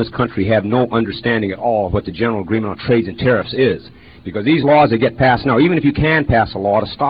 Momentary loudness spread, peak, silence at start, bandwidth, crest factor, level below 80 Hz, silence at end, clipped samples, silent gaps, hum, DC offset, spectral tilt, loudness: 7 LU; -2 dBFS; 0 s; 5.2 kHz; 14 dB; -38 dBFS; 0 s; under 0.1%; none; none; 0.2%; -10.5 dB/octave; -15 LUFS